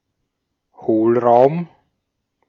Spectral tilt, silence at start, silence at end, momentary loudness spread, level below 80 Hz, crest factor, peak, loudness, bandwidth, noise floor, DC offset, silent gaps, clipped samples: -10 dB/octave; 0.8 s; 0.85 s; 15 LU; -66 dBFS; 18 dB; -2 dBFS; -15 LUFS; 5.6 kHz; -75 dBFS; under 0.1%; none; under 0.1%